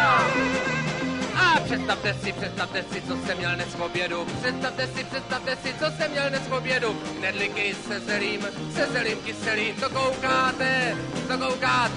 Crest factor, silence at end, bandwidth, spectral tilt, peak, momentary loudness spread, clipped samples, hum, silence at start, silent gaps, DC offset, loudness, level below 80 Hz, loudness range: 16 dB; 0 s; 11 kHz; -4 dB/octave; -8 dBFS; 7 LU; under 0.1%; none; 0 s; none; under 0.1%; -25 LUFS; -54 dBFS; 3 LU